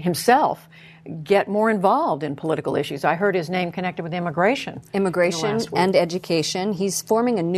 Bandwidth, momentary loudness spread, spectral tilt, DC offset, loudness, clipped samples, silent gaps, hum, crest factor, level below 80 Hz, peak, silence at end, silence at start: 13.5 kHz; 8 LU; -5 dB/octave; under 0.1%; -21 LUFS; under 0.1%; none; none; 18 dB; -62 dBFS; -4 dBFS; 0 s; 0 s